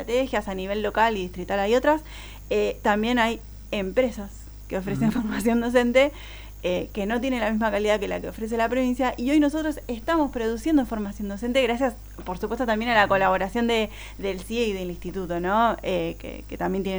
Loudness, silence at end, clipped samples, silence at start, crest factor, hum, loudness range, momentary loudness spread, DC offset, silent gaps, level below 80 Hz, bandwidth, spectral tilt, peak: -24 LUFS; 0 s; under 0.1%; 0 s; 18 dB; 50 Hz at -40 dBFS; 2 LU; 11 LU; under 0.1%; none; -42 dBFS; over 20 kHz; -5.5 dB/octave; -6 dBFS